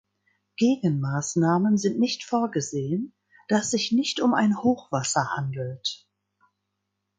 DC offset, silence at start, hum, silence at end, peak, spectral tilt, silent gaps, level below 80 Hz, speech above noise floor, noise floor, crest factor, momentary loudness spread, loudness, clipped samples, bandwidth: under 0.1%; 0.6 s; none; 1.25 s; -8 dBFS; -5 dB/octave; none; -66 dBFS; 56 dB; -80 dBFS; 18 dB; 9 LU; -25 LUFS; under 0.1%; 9.6 kHz